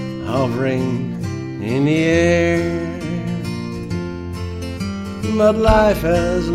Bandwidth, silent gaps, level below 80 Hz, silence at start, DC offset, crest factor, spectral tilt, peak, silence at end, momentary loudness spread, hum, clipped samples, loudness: 15 kHz; none; -32 dBFS; 0 s; under 0.1%; 18 dB; -6.5 dB/octave; 0 dBFS; 0 s; 11 LU; none; under 0.1%; -19 LUFS